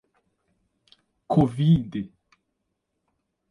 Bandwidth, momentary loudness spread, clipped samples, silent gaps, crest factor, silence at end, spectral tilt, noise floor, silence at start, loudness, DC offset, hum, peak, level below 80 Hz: 10.5 kHz; 14 LU; under 0.1%; none; 20 dB; 1.45 s; -9.5 dB/octave; -78 dBFS; 1.3 s; -23 LUFS; under 0.1%; none; -8 dBFS; -52 dBFS